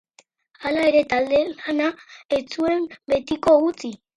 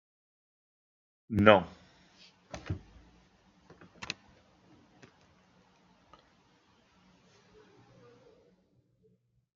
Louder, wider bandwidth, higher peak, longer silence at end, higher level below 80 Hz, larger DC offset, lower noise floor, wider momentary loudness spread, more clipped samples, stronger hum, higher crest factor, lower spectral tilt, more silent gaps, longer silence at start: first, -21 LUFS vs -28 LUFS; first, 11 kHz vs 7.4 kHz; second, -6 dBFS vs -2 dBFS; second, 0.2 s vs 5.5 s; first, -56 dBFS vs -66 dBFS; neither; second, -58 dBFS vs -70 dBFS; second, 8 LU vs 25 LU; neither; neither; second, 16 dB vs 34 dB; about the same, -5 dB/octave vs -4.5 dB/octave; first, 2.25-2.29 s vs none; second, 0.6 s vs 1.3 s